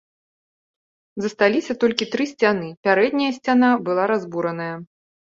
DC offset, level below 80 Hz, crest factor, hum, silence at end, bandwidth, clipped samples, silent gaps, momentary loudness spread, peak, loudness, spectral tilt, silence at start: under 0.1%; -66 dBFS; 20 dB; none; 0.55 s; 7.6 kHz; under 0.1%; 2.77-2.83 s; 11 LU; -2 dBFS; -20 LUFS; -5.5 dB/octave; 1.15 s